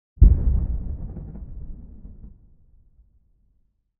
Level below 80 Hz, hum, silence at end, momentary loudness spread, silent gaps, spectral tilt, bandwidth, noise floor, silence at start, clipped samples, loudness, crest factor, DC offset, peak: -24 dBFS; none; 1.7 s; 27 LU; none; -15.5 dB/octave; 1.4 kHz; -66 dBFS; 0.2 s; under 0.1%; -23 LUFS; 22 dB; under 0.1%; -2 dBFS